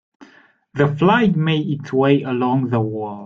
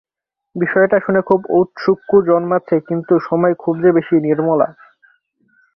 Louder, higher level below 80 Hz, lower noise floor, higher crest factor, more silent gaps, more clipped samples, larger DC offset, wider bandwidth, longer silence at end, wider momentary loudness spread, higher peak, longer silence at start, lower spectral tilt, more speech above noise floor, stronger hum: second, -18 LUFS vs -15 LUFS; about the same, -54 dBFS vs -58 dBFS; second, -50 dBFS vs -58 dBFS; about the same, 16 dB vs 14 dB; neither; neither; neither; first, 7.2 kHz vs 5.8 kHz; second, 0 s vs 1.05 s; about the same, 7 LU vs 5 LU; about the same, -2 dBFS vs -2 dBFS; second, 0.2 s vs 0.55 s; second, -8.5 dB/octave vs -10 dB/octave; second, 33 dB vs 44 dB; neither